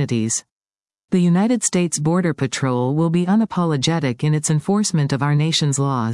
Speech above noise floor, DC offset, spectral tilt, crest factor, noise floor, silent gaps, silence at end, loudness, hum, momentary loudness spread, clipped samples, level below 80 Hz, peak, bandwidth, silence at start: over 72 dB; under 0.1%; -5 dB/octave; 14 dB; under -90 dBFS; 0.51-0.61 s, 1.04-1.08 s; 0 s; -19 LUFS; none; 4 LU; under 0.1%; -60 dBFS; -4 dBFS; 12 kHz; 0 s